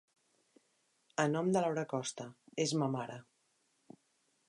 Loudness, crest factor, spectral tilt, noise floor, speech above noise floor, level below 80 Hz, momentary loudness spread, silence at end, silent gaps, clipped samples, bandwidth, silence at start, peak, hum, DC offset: -36 LUFS; 22 dB; -5 dB/octave; -77 dBFS; 42 dB; -84 dBFS; 14 LU; 1.25 s; none; under 0.1%; 11.5 kHz; 1.2 s; -16 dBFS; none; under 0.1%